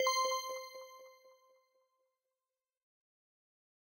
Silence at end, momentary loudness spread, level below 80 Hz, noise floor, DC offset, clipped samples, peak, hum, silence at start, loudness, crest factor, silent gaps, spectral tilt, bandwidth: 2.7 s; 24 LU; under -90 dBFS; under -90 dBFS; under 0.1%; under 0.1%; -20 dBFS; none; 0 s; -36 LUFS; 22 dB; none; 3.5 dB/octave; 16 kHz